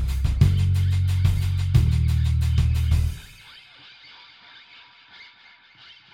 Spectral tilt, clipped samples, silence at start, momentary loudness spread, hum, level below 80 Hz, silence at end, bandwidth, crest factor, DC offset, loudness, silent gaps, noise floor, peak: -6.5 dB/octave; under 0.1%; 0 s; 21 LU; none; -28 dBFS; 0.9 s; 15.5 kHz; 18 dB; under 0.1%; -22 LUFS; none; -52 dBFS; -4 dBFS